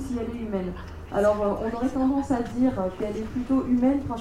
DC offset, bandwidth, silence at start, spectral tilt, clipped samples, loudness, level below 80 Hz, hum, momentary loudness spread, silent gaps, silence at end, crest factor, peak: under 0.1%; 11.5 kHz; 0 s; -7.5 dB/octave; under 0.1%; -26 LUFS; -42 dBFS; none; 8 LU; none; 0 s; 14 dB; -10 dBFS